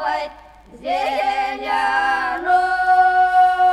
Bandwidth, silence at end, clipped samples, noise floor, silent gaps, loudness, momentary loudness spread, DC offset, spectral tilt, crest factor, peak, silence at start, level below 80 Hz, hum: 11.5 kHz; 0 s; under 0.1%; -43 dBFS; none; -17 LUFS; 10 LU; under 0.1%; -2.5 dB/octave; 12 dB; -6 dBFS; 0 s; -50 dBFS; none